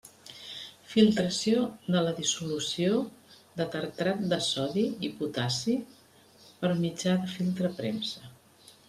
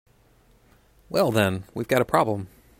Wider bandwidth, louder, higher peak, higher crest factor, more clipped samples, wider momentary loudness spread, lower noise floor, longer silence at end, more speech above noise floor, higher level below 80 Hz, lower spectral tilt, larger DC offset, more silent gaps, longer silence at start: second, 14.5 kHz vs 16 kHz; second, -29 LUFS vs -24 LUFS; second, -10 dBFS vs -4 dBFS; about the same, 20 dB vs 22 dB; neither; first, 15 LU vs 9 LU; about the same, -58 dBFS vs -59 dBFS; first, 0.55 s vs 0.35 s; second, 29 dB vs 36 dB; second, -68 dBFS vs -56 dBFS; about the same, -5 dB/octave vs -5.5 dB/octave; neither; neither; second, 0.05 s vs 1.1 s